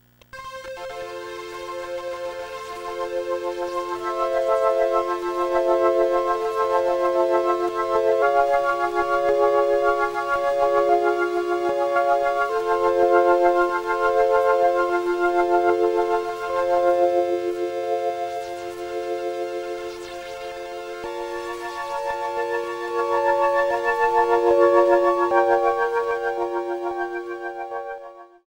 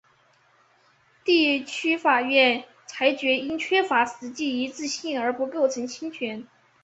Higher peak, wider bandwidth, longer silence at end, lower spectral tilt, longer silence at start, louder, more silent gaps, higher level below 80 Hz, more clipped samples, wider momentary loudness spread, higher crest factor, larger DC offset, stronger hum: about the same, -4 dBFS vs -4 dBFS; first, 16.5 kHz vs 8.2 kHz; second, 0.2 s vs 0.4 s; first, -4.5 dB/octave vs -2 dB/octave; second, 0.35 s vs 1.25 s; about the same, -22 LUFS vs -24 LUFS; neither; first, -54 dBFS vs -72 dBFS; neither; about the same, 14 LU vs 12 LU; about the same, 18 dB vs 20 dB; neither; first, 60 Hz at -60 dBFS vs none